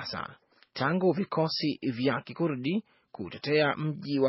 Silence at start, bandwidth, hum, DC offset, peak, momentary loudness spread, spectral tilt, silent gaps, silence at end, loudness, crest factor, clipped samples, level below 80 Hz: 0 s; 6 kHz; none; under 0.1%; -12 dBFS; 13 LU; -4.5 dB/octave; none; 0 s; -29 LUFS; 18 dB; under 0.1%; -70 dBFS